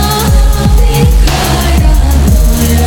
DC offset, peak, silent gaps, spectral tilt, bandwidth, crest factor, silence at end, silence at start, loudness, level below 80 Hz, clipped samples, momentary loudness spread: under 0.1%; 0 dBFS; none; -5 dB/octave; 19.5 kHz; 6 dB; 0 s; 0 s; -9 LUFS; -8 dBFS; 0.3%; 1 LU